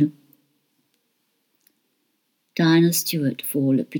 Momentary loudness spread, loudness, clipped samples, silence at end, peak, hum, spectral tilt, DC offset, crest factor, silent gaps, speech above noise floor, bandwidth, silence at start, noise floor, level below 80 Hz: 8 LU; -21 LUFS; under 0.1%; 0 s; -8 dBFS; none; -5 dB/octave; under 0.1%; 16 dB; none; 52 dB; 19.5 kHz; 0 s; -72 dBFS; -88 dBFS